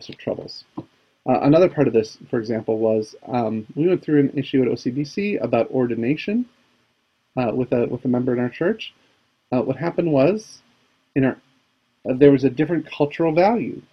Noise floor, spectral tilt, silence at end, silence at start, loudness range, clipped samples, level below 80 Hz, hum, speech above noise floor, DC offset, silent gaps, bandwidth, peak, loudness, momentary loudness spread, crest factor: -67 dBFS; -8 dB/octave; 0.1 s; 0 s; 4 LU; under 0.1%; -56 dBFS; none; 47 dB; under 0.1%; none; 6.6 kHz; 0 dBFS; -21 LUFS; 13 LU; 20 dB